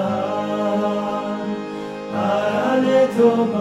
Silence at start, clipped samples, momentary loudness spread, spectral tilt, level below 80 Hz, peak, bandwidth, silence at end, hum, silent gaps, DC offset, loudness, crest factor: 0 s; under 0.1%; 11 LU; -6.5 dB/octave; -62 dBFS; -4 dBFS; 13 kHz; 0 s; none; none; under 0.1%; -20 LUFS; 14 dB